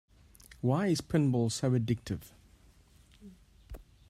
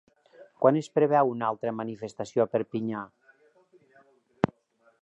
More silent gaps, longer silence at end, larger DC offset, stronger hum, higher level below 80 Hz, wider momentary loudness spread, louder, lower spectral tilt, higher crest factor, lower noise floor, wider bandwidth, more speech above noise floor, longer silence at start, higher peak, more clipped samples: neither; second, 0.3 s vs 0.55 s; neither; neither; first, -56 dBFS vs -66 dBFS; first, 22 LU vs 13 LU; second, -31 LUFS vs -28 LUFS; about the same, -6.5 dB/octave vs -7.5 dB/octave; second, 18 dB vs 24 dB; second, -61 dBFS vs -66 dBFS; first, 14.5 kHz vs 8.4 kHz; second, 31 dB vs 40 dB; first, 0.65 s vs 0.4 s; second, -16 dBFS vs -4 dBFS; neither